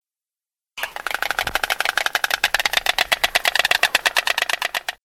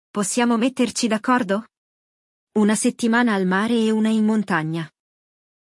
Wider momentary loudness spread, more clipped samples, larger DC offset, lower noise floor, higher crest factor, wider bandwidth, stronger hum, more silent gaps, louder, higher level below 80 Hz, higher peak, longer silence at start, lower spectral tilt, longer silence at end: about the same, 9 LU vs 8 LU; neither; neither; about the same, under -90 dBFS vs under -90 dBFS; first, 22 dB vs 16 dB; first, 19 kHz vs 12 kHz; neither; second, none vs 1.78-2.47 s; about the same, -19 LUFS vs -20 LUFS; first, -50 dBFS vs -70 dBFS; first, 0 dBFS vs -4 dBFS; first, 0.75 s vs 0.15 s; second, 1 dB/octave vs -4.5 dB/octave; second, 0.1 s vs 0.8 s